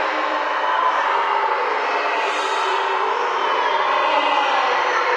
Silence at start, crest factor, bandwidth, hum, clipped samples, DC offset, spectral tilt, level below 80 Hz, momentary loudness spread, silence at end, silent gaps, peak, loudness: 0 s; 14 dB; 10.5 kHz; none; under 0.1%; under 0.1%; -0.5 dB/octave; -74 dBFS; 3 LU; 0 s; none; -6 dBFS; -19 LUFS